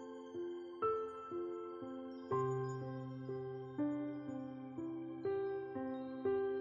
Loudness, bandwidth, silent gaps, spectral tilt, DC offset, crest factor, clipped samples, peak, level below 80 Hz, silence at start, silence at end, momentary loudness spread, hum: -43 LUFS; 7.4 kHz; none; -8.5 dB/octave; under 0.1%; 16 dB; under 0.1%; -26 dBFS; -80 dBFS; 0 s; 0 s; 8 LU; none